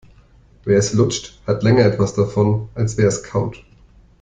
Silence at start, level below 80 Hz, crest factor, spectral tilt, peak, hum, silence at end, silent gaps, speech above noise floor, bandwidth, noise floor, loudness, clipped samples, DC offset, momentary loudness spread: 0.65 s; -44 dBFS; 16 dB; -6 dB/octave; -2 dBFS; none; 0.65 s; none; 32 dB; 9.2 kHz; -49 dBFS; -18 LUFS; under 0.1%; under 0.1%; 9 LU